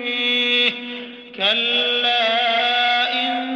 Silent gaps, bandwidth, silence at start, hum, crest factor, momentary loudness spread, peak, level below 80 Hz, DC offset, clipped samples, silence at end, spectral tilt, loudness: none; 8.8 kHz; 0 s; none; 16 dB; 12 LU; -4 dBFS; -72 dBFS; under 0.1%; under 0.1%; 0 s; -2.5 dB/octave; -17 LUFS